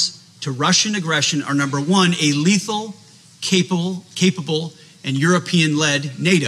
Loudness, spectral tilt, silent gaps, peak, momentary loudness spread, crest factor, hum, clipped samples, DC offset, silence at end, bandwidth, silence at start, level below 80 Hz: -18 LUFS; -4 dB/octave; none; -2 dBFS; 11 LU; 16 dB; none; under 0.1%; under 0.1%; 0 s; 13 kHz; 0 s; -70 dBFS